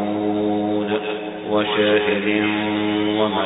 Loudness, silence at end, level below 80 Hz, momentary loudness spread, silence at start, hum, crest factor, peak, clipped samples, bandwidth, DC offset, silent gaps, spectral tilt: -20 LUFS; 0 s; -56 dBFS; 6 LU; 0 s; none; 16 dB; -4 dBFS; under 0.1%; 4 kHz; under 0.1%; none; -10.5 dB/octave